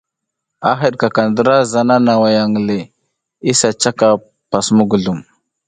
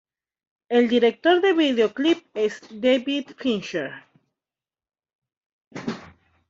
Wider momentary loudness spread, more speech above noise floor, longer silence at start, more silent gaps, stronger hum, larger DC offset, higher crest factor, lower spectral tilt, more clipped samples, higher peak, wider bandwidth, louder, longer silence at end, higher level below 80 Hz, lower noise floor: second, 8 LU vs 15 LU; second, 65 dB vs over 69 dB; about the same, 0.6 s vs 0.7 s; second, none vs 5.15-5.19 s, 5.37-5.71 s; neither; neither; about the same, 14 dB vs 18 dB; about the same, -4.5 dB/octave vs -5 dB/octave; neither; first, 0 dBFS vs -6 dBFS; first, 9.6 kHz vs 7.8 kHz; first, -14 LUFS vs -22 LUFS; about the same, 0.45 s vs 0.45 s; first, -52 dBFS vs -68 dBFS; second, -78 dBFS vs under -90 dBFS